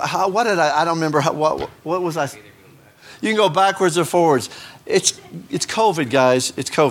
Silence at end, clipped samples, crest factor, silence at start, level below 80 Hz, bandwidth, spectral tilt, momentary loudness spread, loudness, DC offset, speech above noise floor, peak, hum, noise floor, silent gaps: 0 s; under 0.1%; 18 dB; 0 s; -58 dBFS; 17 kHz; -4 dB/octave; 10 LU; -18 LUFS; under 0.1%; 30 dB; -2 dBFS; none; -48 dBFS; none